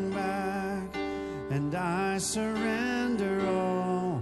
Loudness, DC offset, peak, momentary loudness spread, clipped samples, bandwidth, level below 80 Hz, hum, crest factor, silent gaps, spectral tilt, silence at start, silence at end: -30 LUFS; under 0.1%; -16 dBFS; 6 LU; under 0.1%; 12.5 kHz; -54 dBFS; none; 14 dB; none; -5 dB/octave; 0 s; 0 s